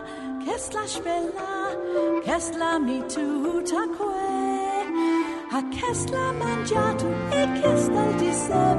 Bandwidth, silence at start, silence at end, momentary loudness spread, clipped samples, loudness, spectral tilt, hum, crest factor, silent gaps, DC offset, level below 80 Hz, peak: 11.5 kHz; 0 s; 0 s; 7 LU; under 0.1%; -25 LUFS; -5 dB/octave; none; 16 dB; none; under 0.1%; -50 dBFS; -8 dBFS